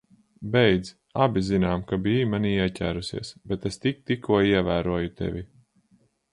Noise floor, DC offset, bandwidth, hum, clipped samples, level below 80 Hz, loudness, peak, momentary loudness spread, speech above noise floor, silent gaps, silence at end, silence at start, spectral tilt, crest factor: -64 dBFS; under 0.1%; 11.5 kHz; none; under 0.1%; -46 dBFS; -25 LUFS; -6 dBFS; 12 LU; 40 dB; none; 0.85 s; 0.4 s; -6.5 dB/octave; 20 dB